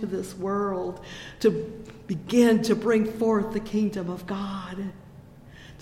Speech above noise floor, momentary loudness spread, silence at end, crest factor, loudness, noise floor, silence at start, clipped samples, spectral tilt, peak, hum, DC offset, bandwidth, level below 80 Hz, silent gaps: 22 dB; 16 LU; 0 s; 18 dB; -26 LUFS; -47 dBFS; 0 s; under 0.1%; -6 dB/octave; -8 dBFS; none; under 0.1%; 15.5 kHz; -52 dBFS; none